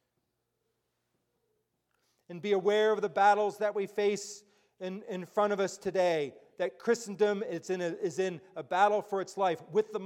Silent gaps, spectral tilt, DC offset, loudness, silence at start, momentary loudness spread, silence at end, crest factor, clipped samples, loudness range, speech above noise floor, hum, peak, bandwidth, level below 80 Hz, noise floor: none; -4.5 dB/octave; under 0.1%; -31 LUFS; 2.3 s; 14 LU; 0 s; 20 dB; under 0.1%; 3 LU; 51 dB; none; -12 dBFS; 14 kHz; -80 dBFS; -81 dBFS